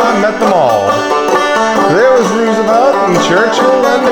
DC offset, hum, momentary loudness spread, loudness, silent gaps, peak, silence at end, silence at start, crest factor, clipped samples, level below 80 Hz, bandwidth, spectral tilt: under 0.1%; none; 3 LU; -10 LUFS; none; 0 dBFS; 0 s; 0 s; 10 dB; under 0.1%; -48 dBFS; 19 kHz; -4.5 dB/octave